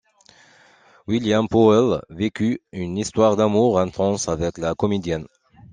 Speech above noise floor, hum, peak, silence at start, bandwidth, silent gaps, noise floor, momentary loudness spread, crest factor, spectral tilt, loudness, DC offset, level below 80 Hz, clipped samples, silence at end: 34 dB; none; -2 dBFS; 1.1 s; 9.8 kHz; none; -53 dBFS; 12 LU; 18 dB; -6 dB/octave; -20 LUFS; under 0.1%; -50 dBFS; under 0.1%; 0.45 s